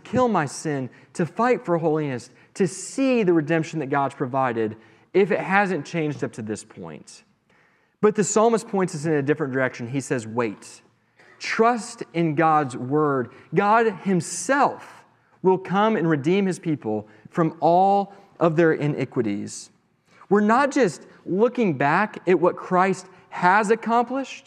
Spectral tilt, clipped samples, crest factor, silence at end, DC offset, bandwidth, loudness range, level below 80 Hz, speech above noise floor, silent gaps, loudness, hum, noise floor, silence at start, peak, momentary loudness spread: -6 dB/octave; under 0.1%; 20 dB; 0.05 s; under 0.1%; 12.5 kHz; 4 LU; -72 dBFS; 39 dB; none; -22 LUFS; none; -61 dBFS; 0.05 s; -2 dBFS; 12 LU